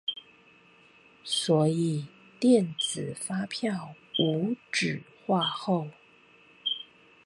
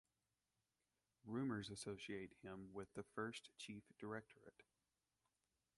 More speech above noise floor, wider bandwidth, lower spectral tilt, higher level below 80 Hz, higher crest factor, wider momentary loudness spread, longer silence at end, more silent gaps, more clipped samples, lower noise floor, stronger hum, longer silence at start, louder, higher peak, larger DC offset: second, 31 dB vs over 37 dB; about the same, 11.5 kHz vs 11.5 kHz; about the same, -5 dB/octave vs -5 dB/octave; first, -74 dBFS vs -80 dBFS; about the same, 20 dB vs 20 dB; about the same, 13 LU vs 14 LU; second, 0.45 s vs 1.15 s; neither; neither; second, -58 dBFS vs under -90 dBFS; neither; second, 0.05 s vs 1.25 s; first, -28 LUFS vs -52 LUFS; first, -10 dBFS vs -34 dBFS; neither